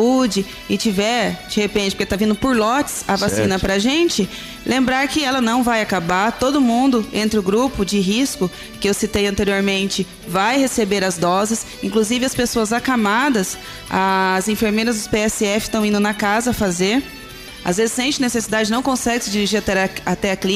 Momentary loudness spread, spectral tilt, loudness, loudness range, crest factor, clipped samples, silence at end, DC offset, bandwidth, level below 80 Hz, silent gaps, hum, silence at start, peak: 5 LU; -4 dB/octave; -18 LUFS; 2 LU; 12 dB; under 0.1%; 0 s; under 0.1%; 16 kHz; -42 dBFS; none; none; 0 s; -6 dBFS